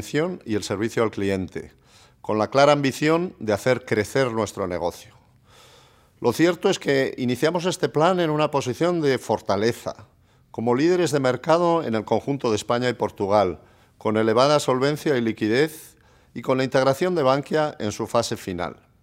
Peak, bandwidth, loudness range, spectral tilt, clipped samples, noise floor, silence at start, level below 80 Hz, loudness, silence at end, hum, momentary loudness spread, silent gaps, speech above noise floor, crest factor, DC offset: -4 dBFS; 16 kHz; 3 LU; -5.5 dB/octave; under 0.1%; -54 dBFS; 0 s; -62 dBFS; -22 LUFS; 0.3 s; none; 9 LU; none; 32 dB; 20 dB; under 0.1%